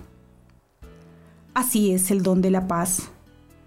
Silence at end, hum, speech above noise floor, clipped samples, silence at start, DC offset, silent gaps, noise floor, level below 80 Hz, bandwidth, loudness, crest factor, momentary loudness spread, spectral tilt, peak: 0.55 s; none; 34 dB; under 0.1%; 0 s; under 0.1%; none; -56 dBFS; -52 dBFS; 16 kHz; -22 LUFS; 14 dB; 7 LU; -5 dB/octave; -12 dBFS